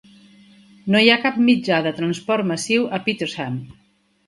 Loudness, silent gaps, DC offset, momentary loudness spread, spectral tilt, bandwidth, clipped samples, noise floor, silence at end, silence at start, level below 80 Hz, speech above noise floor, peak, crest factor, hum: -19 LUFS; none; under 0.1%; 13 LU; -4.5 dB/octave; 11.5 kHz; under 0.1%; -49 dBFS; 0.55 s; 0.85 s; -62 dBFS; 30 dB; 0 dBFS; 20 dB; none